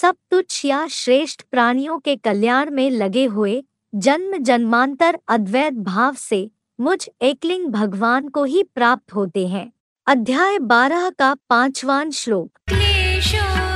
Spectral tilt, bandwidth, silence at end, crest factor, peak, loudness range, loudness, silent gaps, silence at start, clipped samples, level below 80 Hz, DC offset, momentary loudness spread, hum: -4.5 dB/octave; 14 kHz; 0 s; 18 dB; 0 dBFS; 2 LU; -18 LUFS; 9.80-9.96 s; 0 s; under 0.1%; -34 dBFS; under 0.1%; 7 LU; none